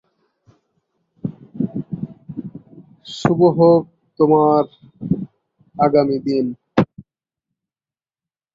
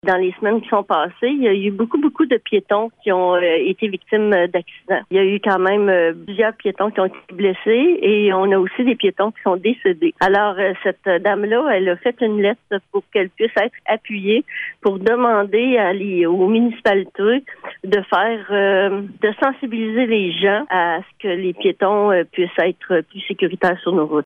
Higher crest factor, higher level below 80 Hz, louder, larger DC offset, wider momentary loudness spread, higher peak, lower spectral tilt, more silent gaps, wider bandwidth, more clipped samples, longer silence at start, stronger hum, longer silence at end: about the same, 18 dB vs 14 dB; first, -56 dBFS vs -62 dBFS; about the same, -18 LUFS vs -18 LUFS; neither; first, 20 LU vs 6 LU; about the same, -2 dBFS vs -2 dBFS; about the same, -8.5 dB/octave vs -7.5 dB/octave; neither; first, 7.6 kHz vs 5.6 kHz; neither; first, 1.25 s vs 0.05 s; neither; first, 1.55 s vs 0 s